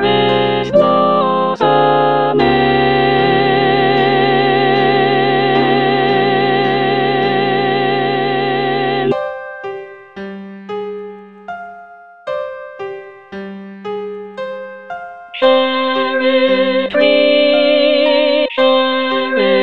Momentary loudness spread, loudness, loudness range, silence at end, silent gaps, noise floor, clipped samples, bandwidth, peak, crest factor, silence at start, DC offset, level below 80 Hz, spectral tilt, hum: 17 LU; -13 LUFS; 15 LU; 0 s; none; -38 dBFS; under 0.1%; 6 kHz; 0 dBFS; 14 dB; 0 s; under 0.1%; -48 dBFS; -7.5 dB/octave; none